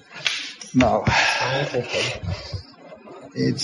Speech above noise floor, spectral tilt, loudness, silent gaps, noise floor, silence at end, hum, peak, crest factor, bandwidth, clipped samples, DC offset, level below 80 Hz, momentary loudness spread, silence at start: 22 dB; -4.5 dB/octave; -22 LUFS; none; -43 dBFS; 0 s; none; -2 dBFS; 22 dB; 11.5 kHz; under 0.1%; under 0.1%; -44 dBFS; 17 LU; 0.1 s